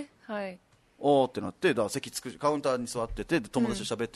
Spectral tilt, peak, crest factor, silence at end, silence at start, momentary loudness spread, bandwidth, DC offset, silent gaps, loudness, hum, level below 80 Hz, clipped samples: -4.5 dB/octave; -12 dBFS; 18 dB; 0.05 s; 0 s; 11 LU; 12.5 kHz; under 0.1%; none; -30 LUFS; none; -52 dBFS; under 0.1%